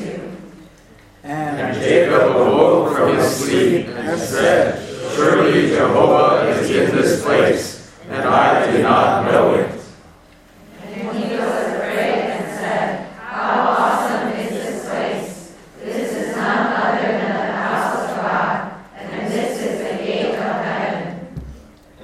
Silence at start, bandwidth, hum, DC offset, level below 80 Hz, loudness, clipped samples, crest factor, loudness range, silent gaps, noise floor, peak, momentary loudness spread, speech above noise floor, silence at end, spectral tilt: 0 s; 15.5 kHz; none; under 0.1%; -50 dBFS; -17 LUFS; under 0.1%; 18 dB; 7 LU; none; -46 dBFS; 0 dBFS; 15 LU; 32 dB; 0 s; -5 dB/octave